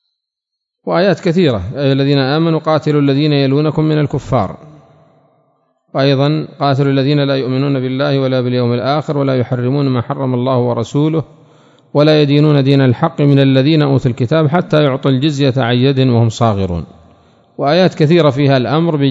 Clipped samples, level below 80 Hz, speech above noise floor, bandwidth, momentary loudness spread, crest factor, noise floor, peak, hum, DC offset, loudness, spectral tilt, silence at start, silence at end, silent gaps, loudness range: 0.1%; -46 dBFS; 67 dB; 7.8 kHz; 6 LU; 12 dB; -79 dBFS; 0 dBFS; none; under 0.1%; -13 LUFS; -8 dB/octave; 0.85 s; 0 s; none; 4 LU